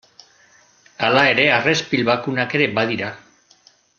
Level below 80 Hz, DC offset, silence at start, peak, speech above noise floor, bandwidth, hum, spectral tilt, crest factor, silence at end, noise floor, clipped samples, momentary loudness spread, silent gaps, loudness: -60 dBFS; under 0.1%; 1 s; -2 dBFS; 36 dB; 8.2 kHz; none; -4.5 dB/octave; 20 dB; 0.8 s; -54 dBFS; under 0.1%; 9 LU; none; -17 LUFS